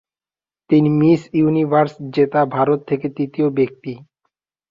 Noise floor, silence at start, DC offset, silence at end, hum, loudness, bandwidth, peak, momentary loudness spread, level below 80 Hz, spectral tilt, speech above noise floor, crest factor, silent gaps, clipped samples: under -90 dBFS; 0.7 s; under 0.1%; 0.75 s; none; -17 LUFS; 7.4 kHz; -2 dBFS; 9 LU; -58 dBFS; -9.5 dB/octave; over 73 dB; 16 dB; none; under 0.1%